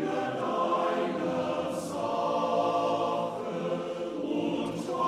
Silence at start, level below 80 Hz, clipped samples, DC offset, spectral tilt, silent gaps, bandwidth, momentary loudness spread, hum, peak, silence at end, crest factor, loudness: 0 s; -68 dBFS; under 0.1%; under 0.1%; -5.5 dB/octave; none; 14 kHz; 6 LU; none; -16 dBFS; 0 s; 14 dB; -30 LUFS